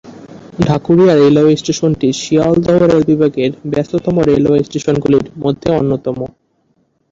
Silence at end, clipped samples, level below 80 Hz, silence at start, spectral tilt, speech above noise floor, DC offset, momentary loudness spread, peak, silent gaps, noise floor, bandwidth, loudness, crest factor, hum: 0.85 s; under 0.1%; -42 dBFS; 0.05 s; -7 dB/octave; 48 dB; under 0.1%; 9 LU; 0 dBFS; none; -59 dBFS; 7.8 kHz; -13 LUFS; 12 dB; none